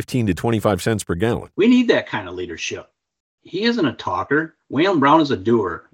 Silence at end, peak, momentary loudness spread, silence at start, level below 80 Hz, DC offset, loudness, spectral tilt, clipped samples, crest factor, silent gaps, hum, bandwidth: 0.15 s; -2 dBFS; 12 LU; 0 s; -52 dBFS; under 0.1%; -19 LUFS; -5.5 dB/octave; under 0.1%; 18 dB; 3.20-3.38 s; none; 17 kHz